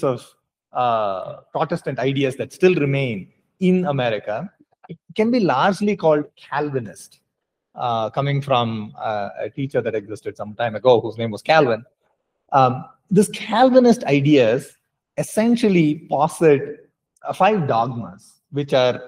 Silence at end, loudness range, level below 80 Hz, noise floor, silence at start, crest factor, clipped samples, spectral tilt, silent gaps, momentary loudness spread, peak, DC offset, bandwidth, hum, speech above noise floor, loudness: 0 s; 6 LU; -64 dBFS; -78 dBFS; 0 s; 20 dB; under 0.1%; -6.5 dB/octave; none; 14 LU; 0 dBFS; under 0.1%; 16 kHz; none; 59 dB; -19 LUFS